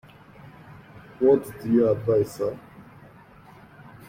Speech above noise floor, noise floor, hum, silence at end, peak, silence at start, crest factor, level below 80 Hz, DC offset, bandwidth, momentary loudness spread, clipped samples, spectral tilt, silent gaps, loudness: 28 dB; -49 dBFS; none; 1.25 s; -8 dBFS; 0.45 s; 20 dB; -58 dBFS; under 0.1%; 16 kHz; 14 LU; under 0.1%; -8 dB/octave; none; -23 LUFS